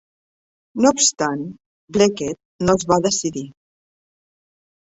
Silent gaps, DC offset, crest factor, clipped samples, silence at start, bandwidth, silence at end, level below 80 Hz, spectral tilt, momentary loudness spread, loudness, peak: 1.66-1.88 s, 2.45-2.59 s; under 0.1%; 20 dB; under 0.1%; 0.75 s; 8.4 kHz; 1.35 s; -52 dBFS; -3.5 dB/octave; 17 LU; -19 LUFS; -2 dBFS